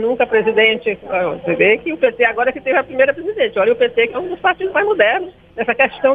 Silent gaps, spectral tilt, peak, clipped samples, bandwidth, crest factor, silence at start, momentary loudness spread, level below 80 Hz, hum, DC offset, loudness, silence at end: none; -7 dB/octave; 0 dBFS; under 0.1%; 4.6 kHz; 14 dB; 0 s; 6 LU; -52 dBFS; none; under 0.1%; -16 LUFS; 0 s